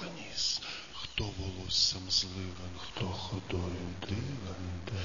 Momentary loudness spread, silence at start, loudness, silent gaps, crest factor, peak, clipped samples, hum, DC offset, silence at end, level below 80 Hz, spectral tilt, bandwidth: 13 LU; 0 s; -34 LUFS; none; 22 dB; -16 dBFS; under 0.1%; none; 0.4%; 0 s; -52 dBFS; -3 dB/octave; 7.4 kHz